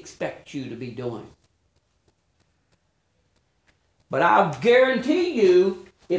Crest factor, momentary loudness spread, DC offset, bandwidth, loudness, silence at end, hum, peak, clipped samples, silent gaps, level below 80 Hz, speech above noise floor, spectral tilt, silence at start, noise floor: 20 dB; 17 LU; under 0.1%; 8 kHz; -21 LUFS; 0 s; none; -4 dBFS; under 0.1%; none; -64 dBFS; 49 dB; -6 dB/octave; 0.05 s; -69 dBFS